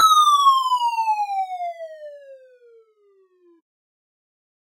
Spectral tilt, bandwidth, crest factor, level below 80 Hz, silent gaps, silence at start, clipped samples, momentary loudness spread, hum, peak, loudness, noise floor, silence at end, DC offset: 3 dB/octave; 16 kHz; 18 dB; under -90 dBFS; none; 0 s; under 0.1%; 23 LU; none; -6 dBFS; -18 LUFS; -59 dBFS; 2.45 s; under 0.1%